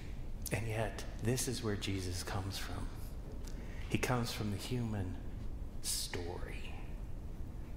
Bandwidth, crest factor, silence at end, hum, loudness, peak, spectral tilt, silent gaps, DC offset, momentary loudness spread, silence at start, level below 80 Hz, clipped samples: 16 kHz; 22 dB; 0 s; none; -40 LUFS; -18 dBFS; -4.5 dB/octave; none; under 0.1%; 12 LU; 0 s; -44 dBFS; under 0.1%